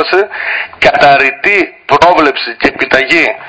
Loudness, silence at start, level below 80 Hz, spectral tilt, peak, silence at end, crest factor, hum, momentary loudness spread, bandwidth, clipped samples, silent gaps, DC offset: -9 LUFS; 0 s; -40 dBFS; -4 dB/octave; 0 dBFS; 0 s; 10 dB; none; 7 LU; 8 kHz; 3%; none; 0.3%